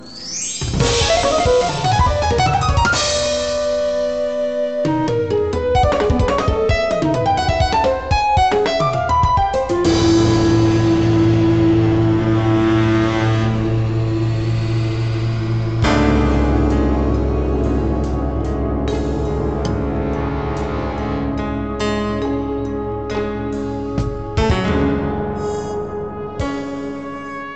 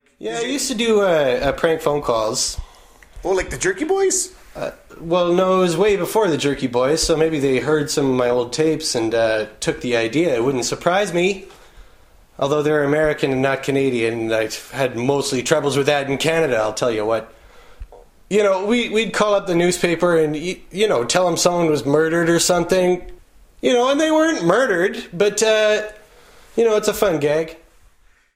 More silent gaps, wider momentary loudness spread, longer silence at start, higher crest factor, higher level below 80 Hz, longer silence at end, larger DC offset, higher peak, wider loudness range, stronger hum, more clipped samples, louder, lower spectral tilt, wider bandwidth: neither; about the same, 8 LU vs 7 LU; second, 0 s vs 0.2 s; about the same, 14 dB vs 18 dB; first, -26 dBFS vs -44 dBFS; second, 0 s vs 0.8 s; first, 0.8% vs under 0.1%; about the same, -2 dBFS vs -2 dBFS; first, 6 LU vs 3 LU; neither; neither; about the same, -18 LUFS vs -18 LUFS; first, -6 dB/octave vs -4 dB/octave; second, 9 kHz vs 16 kHz